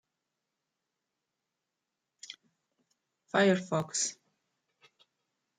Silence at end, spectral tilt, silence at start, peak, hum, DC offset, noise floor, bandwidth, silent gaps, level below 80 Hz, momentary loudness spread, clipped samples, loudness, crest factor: 1.45 s; -4 dB/octave; 2.3 s; -12 dBFS; none; under 0.1%; -87 dBFS; 9.6 kHz; none; -78 dBFS; 23 LU; under 0.1%; -30 LUFS; 24 dB